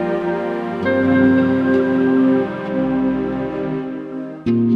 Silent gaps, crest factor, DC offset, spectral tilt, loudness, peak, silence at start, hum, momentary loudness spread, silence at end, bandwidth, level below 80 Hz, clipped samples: none; 16 dB; under 0.1%; -9 dB/octave; -18 LUFS; -2 dBFS; 0 s; none; 10 LU; 0 s; 5 kHz; -48 dBFS; under 0.1%